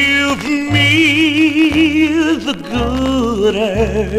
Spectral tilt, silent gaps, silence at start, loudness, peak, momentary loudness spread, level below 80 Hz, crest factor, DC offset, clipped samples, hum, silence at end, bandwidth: -5 dB/octave; none; 0 s; -13 LUFS; 0 dBFS; 7 LU; -30 dBFS; 12 dB; 0.2%; under 0.1%; none; 0 s; 15 kHz